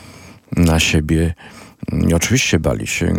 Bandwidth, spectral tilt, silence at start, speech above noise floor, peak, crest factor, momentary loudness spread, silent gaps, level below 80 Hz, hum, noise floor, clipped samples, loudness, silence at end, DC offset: 17 kHz; -4.5 dB/octave; 0.05 s; 24 dB; 0 dBFS; 16 dB; 11 LU; none; -32 dBFS; none; -40 dBFS; under 0.1%; -16 LUFS; 0 s; under 0.1%